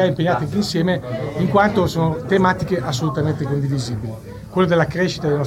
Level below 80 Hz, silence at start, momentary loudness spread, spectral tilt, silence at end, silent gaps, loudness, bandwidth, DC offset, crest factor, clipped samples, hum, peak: -44 dBFS; 0 s; 9 LU; -6.5 dB/octave; 0 s; none; -19 LUFS; 15.5 kHz; under 0.1%; 16 dB; under 0.1%; none; -2 dBFS